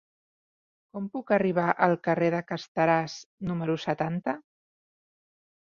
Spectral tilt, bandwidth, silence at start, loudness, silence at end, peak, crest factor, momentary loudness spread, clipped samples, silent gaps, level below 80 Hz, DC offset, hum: -7 dB/octave; 7.4 kHz; 0.95 s; -27 LUFS; 1.3 s; -6 dBFS; 24 dB; 13 LU; under 0.1%; 2.68-2.75 s, 3.26-3.38 s; -66 dBFS; under 0.1%; none